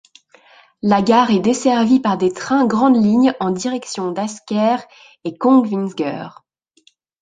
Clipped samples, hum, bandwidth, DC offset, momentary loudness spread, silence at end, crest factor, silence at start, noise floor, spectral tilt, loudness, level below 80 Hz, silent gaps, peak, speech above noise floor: under 0.1%; none; 9.6 kHz; under 0.1%; 11 LU; 0.9 s; 16 dB; 0.85 s; -57 dBFS; -5.5 dB/octave; -16 LUFS; -58 dBFS; none; 0 dBFS; 41 dB